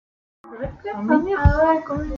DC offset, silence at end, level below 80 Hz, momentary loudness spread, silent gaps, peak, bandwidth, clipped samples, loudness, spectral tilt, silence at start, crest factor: under 0.1%; 0 s; -30 dBFS; 15 LU; none; -2 dBFS; 7 kHz; under 0.1%; -20 LUFS; -9.5 dB/octave; 0.45 s; 18 dB